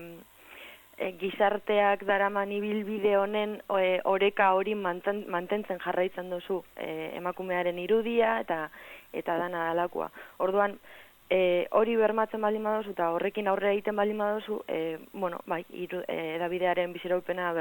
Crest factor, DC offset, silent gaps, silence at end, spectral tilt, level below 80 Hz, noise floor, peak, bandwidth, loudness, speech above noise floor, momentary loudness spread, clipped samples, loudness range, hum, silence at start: 18 dB; under 0.1%; none; 0 s; -6.5 dB/octave; -70 dBFS; -50 dBFS; -12 dBFS; 17.5 kHz; -29 LUFS; 21 dB; 11 LU; under 0.1%; 4 LU; none; 0 s